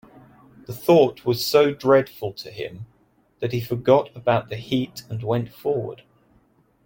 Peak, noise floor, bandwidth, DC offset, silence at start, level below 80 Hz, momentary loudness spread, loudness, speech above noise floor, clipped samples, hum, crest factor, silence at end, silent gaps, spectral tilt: -2 dBFS; -61 dBFS; 17 kHz; under 0.1%; 0.7 s; -60 dBFS; 16 LU; -22 LUFS; 40 dB; under 0.1%; none; 20 dB; 0.9 s; none; -6 dB/octave